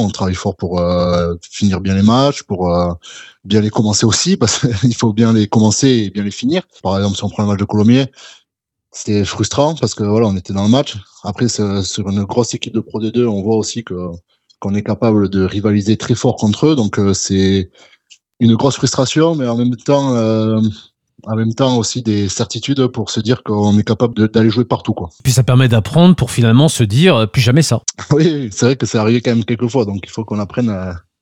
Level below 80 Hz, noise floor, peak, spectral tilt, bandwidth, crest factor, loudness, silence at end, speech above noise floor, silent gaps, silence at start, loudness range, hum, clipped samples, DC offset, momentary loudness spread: -46 dBFS; -73 dBFS; 0 dBFS; -5.5 dB/octave; 16 kHz; 14 dB; -14 LUFS; 0.2 s; 59 dB; none; 0 s; 5 LU; none; under 0.1%; under 0.1%; 9 LU